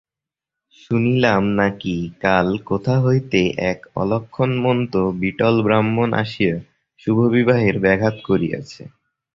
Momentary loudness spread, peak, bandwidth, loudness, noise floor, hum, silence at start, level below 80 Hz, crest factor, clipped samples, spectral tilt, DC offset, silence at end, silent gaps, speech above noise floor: 8 LU; 0 dBFS; 7.4 kHz; -19 LUFS; -87 dBFS; none; 0.9 s; -48 dBFS; 18 dB; under 0.1%; -7.5 dB/octave; under 0.1%; 0.5 s; none; 69 dB